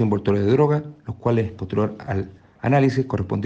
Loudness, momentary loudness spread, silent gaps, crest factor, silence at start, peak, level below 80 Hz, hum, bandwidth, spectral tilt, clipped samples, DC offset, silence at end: -22 LUFS; 10 LU; none; 16 dB; 0 s; -6 dBFS; -50 dBFS; none; 7.8 kHz; -9 dB/octave; under 0.1%; under 0.1%; 0 s